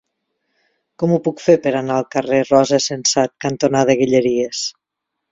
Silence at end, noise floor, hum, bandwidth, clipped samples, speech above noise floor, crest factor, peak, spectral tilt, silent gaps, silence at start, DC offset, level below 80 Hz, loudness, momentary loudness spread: 0.6 s; -79 dBFS; none; 7.8 kHz; under 0.1%; 63 dB; 18 dB; 0 dBFS; -4.5 dB/octave; none; 1 s; under 0.1%; -58 dBFS; -17 LUFS; 7 LU